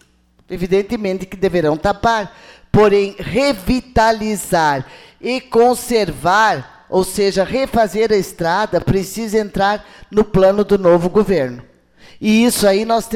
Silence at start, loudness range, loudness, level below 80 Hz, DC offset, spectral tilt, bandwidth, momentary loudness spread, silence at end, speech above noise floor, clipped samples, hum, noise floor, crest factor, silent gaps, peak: 0.5 s; 2 LU; -16 LUFS; -36 dBFS; under 0.1%; -5 dB/octave; 16.5 kHz; 10 LU; 0 s; 29 dB; under 0.1%; none; -45 dBFS; 12 dB; none; -4 dBFS